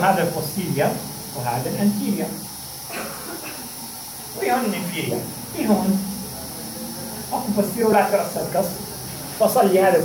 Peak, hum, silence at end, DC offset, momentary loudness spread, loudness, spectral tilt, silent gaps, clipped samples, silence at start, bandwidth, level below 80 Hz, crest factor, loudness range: -4 dBFS; none; 0 s; under 0.1%; 13 LU; -23 LUFS; -5 dB/octave; none; under 0.1%; 0 s; 17 kHz; -52 dBFS; 18 dB; 5 LU